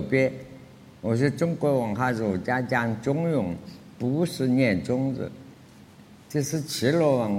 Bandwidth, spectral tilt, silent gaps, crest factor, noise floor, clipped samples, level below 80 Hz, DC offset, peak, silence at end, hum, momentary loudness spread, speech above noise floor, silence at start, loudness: 16.5 kHz; -6.5 dB/octave; none; 18 dB; -50 dBFS; under 0.1%; -60 dBFS; under 0.1%; -8 dBFS; 0 s; none; 12 LU; 25 dB; 0 s; -26 LUFS